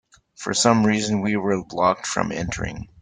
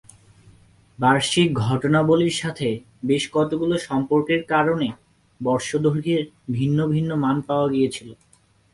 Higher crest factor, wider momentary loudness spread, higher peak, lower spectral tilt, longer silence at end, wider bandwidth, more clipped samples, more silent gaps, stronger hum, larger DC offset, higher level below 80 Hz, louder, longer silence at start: about the same, 20 dB vs 18 dB; first, 11 LU vs 7 LU; about the same, -2 dBFS vs -4 dBFS; about the same, -4.5 dB/octave vs -5.5 dB/octave; second, 0.15 s vs 0.6 s; second, 9.6 kHz vs 11.5 kHz; neither; neither; neither; neither; first, -46 dBFS vs -56 dBFS; about the same, -22 LUFS vs -21 LUFS; second, 0.4 s vs 1 s